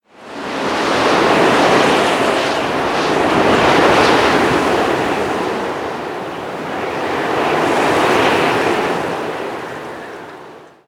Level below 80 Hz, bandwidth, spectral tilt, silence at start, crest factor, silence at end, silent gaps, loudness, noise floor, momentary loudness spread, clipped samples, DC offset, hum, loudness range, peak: -44 dBFS; 18 kHz; -4 dB/octave; 0.2 s; 16 dB; 0.25 s; none; -15 LUFS; -38 dBFS; 13 LU; under 0.1%; under 0.1%; none; 5 LU; 0 dBFS